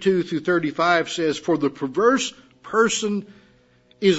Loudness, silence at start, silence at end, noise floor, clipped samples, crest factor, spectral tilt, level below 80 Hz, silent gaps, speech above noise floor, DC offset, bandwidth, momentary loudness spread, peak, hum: -22 LUFS; 0 s; 0 s; -57 dBFS; under 0.1%; 18 dB; -4 dB/octave; -66 dBFS; none; 36 dB; under 0.1%; 8 kHz; 6 LU; -4 dBFS; none